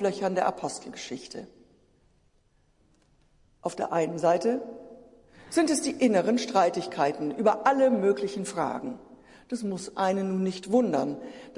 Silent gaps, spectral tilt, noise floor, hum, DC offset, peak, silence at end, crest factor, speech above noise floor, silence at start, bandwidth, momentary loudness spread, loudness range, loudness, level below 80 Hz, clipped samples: none; -5 dB/octave; -66 dBFS; none; under 0.1%; -8 dBFS; 0.05 s; 20 dB; 39 dB; 0 s; 11.5 kHz; 15 LU; 11 LU; -27 LUFS; -68 dBFS; under 0.1%